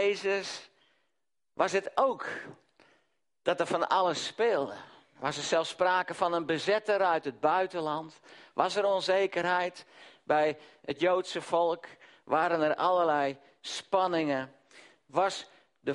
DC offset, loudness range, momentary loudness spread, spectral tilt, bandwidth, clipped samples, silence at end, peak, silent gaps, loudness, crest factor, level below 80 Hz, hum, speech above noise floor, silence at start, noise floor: under 0.1%; 3 LU; 13 LU; -4 dB/octave; 11.5 kHz; under 0.1%; 0 s; -10 dBFS; none; -30 LUFS; 20 dB; -76 dBFS; none; 57 dB; 0 s; -86 dBFS